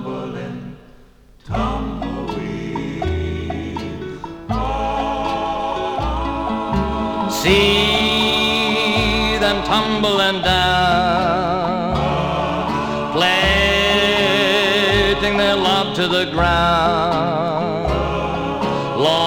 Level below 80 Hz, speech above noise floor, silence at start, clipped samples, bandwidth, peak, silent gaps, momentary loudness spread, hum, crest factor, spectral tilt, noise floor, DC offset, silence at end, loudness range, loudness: -32 dBFS; 31 dB; 0 s; under 0.1%; over 20 kHz; 0 dBFS; none; 11 LU; none; 18 dB; -4.5 dB/octave; -46 dBFS; under 0.1%; 0 s; 10 LU; -17 LUFS